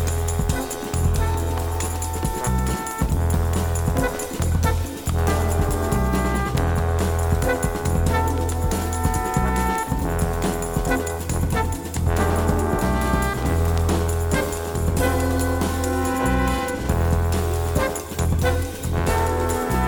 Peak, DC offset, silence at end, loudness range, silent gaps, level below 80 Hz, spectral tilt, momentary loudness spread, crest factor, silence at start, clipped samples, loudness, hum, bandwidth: -6 dBFS; under 0.1%; 0 s; 1 LU; none; -26 dBFS; -5.5 dB/octave; 4 LU; 16 dB; 0 s; under 0.1%; -23 LUFS; none; over 20 kHz